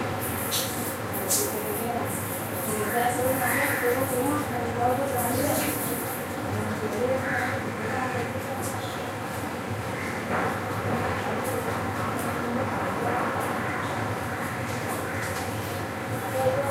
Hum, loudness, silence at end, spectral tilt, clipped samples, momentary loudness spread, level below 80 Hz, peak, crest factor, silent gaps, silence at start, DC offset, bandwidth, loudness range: none; -28 LUFS; 0 s; -4.5 dB/octave; under 0.1%; 6 LU; -54 dBFS; -10 dBFS; 18 dB; none; 0 s; under 0.1%; 16 kHz; 4 LU